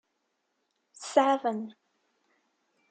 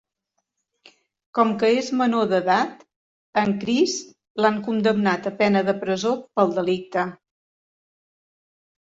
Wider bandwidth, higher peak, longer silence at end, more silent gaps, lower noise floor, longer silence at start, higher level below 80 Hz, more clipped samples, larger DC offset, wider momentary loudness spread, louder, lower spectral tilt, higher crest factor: first, 9.4 kHz vs 8 kHz; second, -8 dBFS vs -4 dBFS; second, 1.2 s vs 1.7 s; second, none vs 2.96-3.33 s, 4.30-4.35 s; about the same, -79 dBFS vs -78 dBFS; second, 1 s vs 1.35 s; second, under -90 dBFS vs -66 dBFS; neither; neither; first, 19 LU vs 7 LU; second, -27 LUFS vs -22 LUFS; about the same, -4 dB/octave vs -5 dB/octave; first, 26 dB vs 18 dB